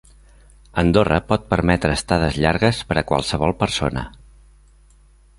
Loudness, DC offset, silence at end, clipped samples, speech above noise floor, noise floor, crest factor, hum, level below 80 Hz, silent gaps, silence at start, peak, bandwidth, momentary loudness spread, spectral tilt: -19 LUFS; under 0.1%; 1.3 s; under 0.1%; 32 dB; -51 dBFS; 20 dB; none; -34 dBFS; none; 0.75 s; -2 dBFS; 11.5 kHz; 6 LU; -5.5 dB/octave